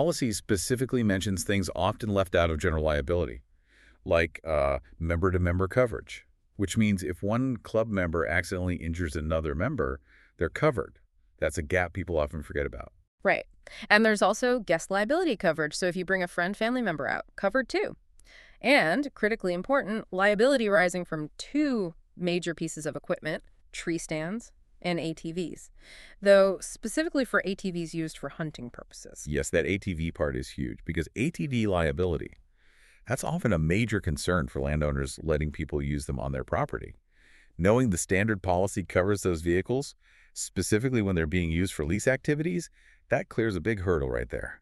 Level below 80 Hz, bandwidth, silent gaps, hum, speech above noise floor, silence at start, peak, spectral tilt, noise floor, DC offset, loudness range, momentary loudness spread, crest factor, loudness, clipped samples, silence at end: -44 dBFS; 13.5 kHz; 13.08-13.18 s; none; 32 dB; 0 s; -4 dBFS; -5.5 dB/octave; -60 dBFS; under 0.1%; 5 LU; 11 LU; 24 dB; -28 LUFS; under 0.1%; 0.05 s